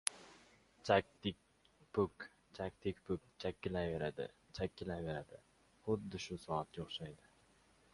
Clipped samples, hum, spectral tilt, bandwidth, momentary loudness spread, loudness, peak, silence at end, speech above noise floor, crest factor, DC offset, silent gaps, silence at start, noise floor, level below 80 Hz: under 0.1%; none; -4.5 dB/octave; 11.5 kHz; 18 LU; -42 LUFS; -10 dBFS; 0.8 s; 30 dB; 32 dB; under 0.1%; none; 0.05 s; -71 dBFS; -62 dBFS